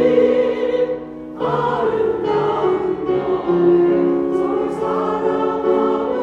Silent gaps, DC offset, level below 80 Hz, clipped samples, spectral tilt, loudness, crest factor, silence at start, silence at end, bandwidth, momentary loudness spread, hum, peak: none; under 0.1%; -50 dBFS; under 0.1%; -8 dB/octave; -18 LUFS; 14 dB; 0 s; 0 s; 7 kHz; 6 LU; none; -4 dBFS